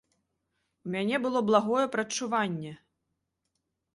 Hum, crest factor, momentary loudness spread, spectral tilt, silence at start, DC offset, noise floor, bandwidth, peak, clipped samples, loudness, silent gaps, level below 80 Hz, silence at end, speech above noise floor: none; 22 dB; 13 LU; -4.5 dB/octave; 0.85 s; under 0.1%; -82 dBFS; 11.5 kHz; -8 dBFS; under 0.1%; -28 LUFS; none; -74 dBFS; 1.2 s; 54 dB